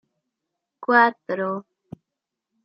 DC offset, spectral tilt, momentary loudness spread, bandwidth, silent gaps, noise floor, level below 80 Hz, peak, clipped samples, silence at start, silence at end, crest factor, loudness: under 0.1%; -8 dB/octave; 15 LU; 5.8 kHz; none; -85 dBFS; -76 dBFS; -4 dBFS; under 0.1%; 0.8 s; 1.05 s; 22 dB; -21 LUFS